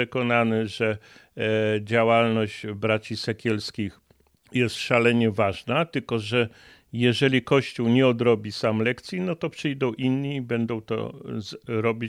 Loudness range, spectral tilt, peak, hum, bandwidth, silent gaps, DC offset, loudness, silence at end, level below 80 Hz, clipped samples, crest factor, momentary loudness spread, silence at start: 3 LU; -6.5 dB/octave; -4 dBFS; none; 12.5 kHz; none; under 0.1%; -24 LUFS; 0 s; -62 dBFS; under 0.1%; 20 dB; 10 LU; 0 s